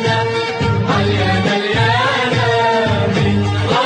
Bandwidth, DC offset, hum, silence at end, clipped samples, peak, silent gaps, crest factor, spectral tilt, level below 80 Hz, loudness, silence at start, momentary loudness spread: 9.4 kHz; under 0.1%; none; 0 s; under 0.1%; -2 dBFS; none; 12 dB; -6 dB/octave; -38 dBFS; -15 LUFS; 0 s; 3 LU